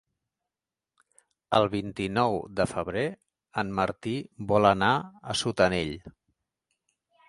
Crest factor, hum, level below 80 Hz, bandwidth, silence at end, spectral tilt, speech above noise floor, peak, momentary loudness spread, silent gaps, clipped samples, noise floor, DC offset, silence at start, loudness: 22 dB; none; -54 dBFS; 11.5 kHz; 1.2 s; -5 dB/octave; over 63 dB; -6 dBFS; 11 LU; none; under 0.1%; under -90 dBFS; under 0.1%; 1.5 s; -27 LUFS